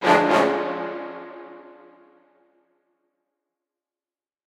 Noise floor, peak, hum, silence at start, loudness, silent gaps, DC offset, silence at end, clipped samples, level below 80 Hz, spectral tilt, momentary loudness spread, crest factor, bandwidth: under -90 dBFS; -4 dBFS; none; 0 s; -21 LUFS; none; under 0.1%; 2.9 s; under 0.1%; -80 dBFS; -5 dB/octave; 25 LU; 22 dB; 15.5 kHz